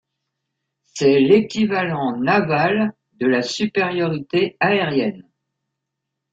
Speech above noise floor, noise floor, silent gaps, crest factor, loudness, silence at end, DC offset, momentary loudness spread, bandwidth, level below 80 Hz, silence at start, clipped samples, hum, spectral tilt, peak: 62 dB; -80 dBFS; none; 18 dB; -19 LUFS; 1.1 s; under 0.1%; 7 LU; 7.8 kHz; -60 dBFS; 0.95 s; under 0.1%; none; -5.5 dB/octave; -2 dBFS